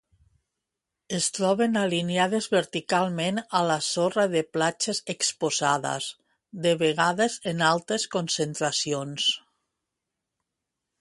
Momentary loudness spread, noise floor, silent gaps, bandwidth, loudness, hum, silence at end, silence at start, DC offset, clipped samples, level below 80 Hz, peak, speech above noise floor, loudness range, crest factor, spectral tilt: 5 LU; -85 dBFS; none; 11.5 kHz; -25 LUFS; none; 1.65 s; 1.1 s; under 0.1%; under 0.1%; -70 dBFS; -6 dBFS; 60 dB; 2 LU; 20 dB; -3.5 dB/octave